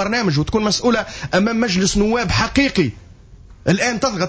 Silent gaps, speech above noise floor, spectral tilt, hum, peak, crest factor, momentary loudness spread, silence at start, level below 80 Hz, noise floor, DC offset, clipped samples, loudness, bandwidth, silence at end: none; 25 dB; -4.5 dB/octave; none; -4 dBFS; 14 dB; 4 LU; 0 s; -36 dBFS; -42 dBFS; under 0.1%; under 0.1%; -18 LUFS; 8 kHz; 0 s